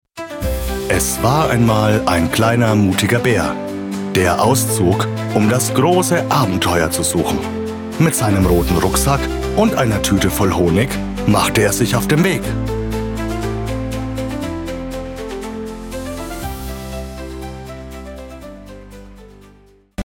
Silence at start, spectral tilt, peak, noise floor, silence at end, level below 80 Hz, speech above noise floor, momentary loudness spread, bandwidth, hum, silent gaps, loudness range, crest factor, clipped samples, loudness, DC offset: 0.15 s; -5 dB/octave; -2 dBFS; -48 dBFS; 0.05 s; -30 dBFS; 33 dB; 15 LU; 19.5 kHz; none; none; 13 LU; 14 dB; under 0.1%; -16 LUFS; under 0.1%